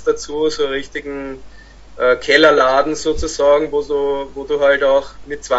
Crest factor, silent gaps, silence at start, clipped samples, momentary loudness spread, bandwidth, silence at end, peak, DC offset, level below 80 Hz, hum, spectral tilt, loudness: 16 dB; none; 0 s; under 0.1%; 17 LU; 8 kHz; 0 s; 0 dBFS; under 0.1%; -38 dBFS; none; -3 dB/octave; -16 LUFS